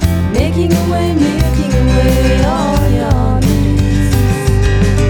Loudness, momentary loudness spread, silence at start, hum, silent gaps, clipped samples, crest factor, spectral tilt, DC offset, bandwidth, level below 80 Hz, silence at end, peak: -12 LUFS; 2 LU; 0 s; none; none; under 0.1%; 10 dB; -6.5 dB/octave; under 0.1%; over 20 kHz; -16 dBFS; 0 s; 0 dBFS